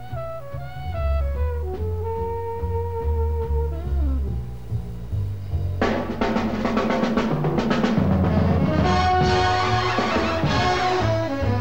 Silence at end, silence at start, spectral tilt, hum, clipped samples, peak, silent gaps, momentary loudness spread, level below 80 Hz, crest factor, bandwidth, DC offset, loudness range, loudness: 0 s; 0 s; -6.5 dB/octave; none; under 0.1%; -6 dBFS; none; 11 LU; -30 dBFS; 14 dB; 16.5 kHz; 1%; 7 LU; -23 LUFS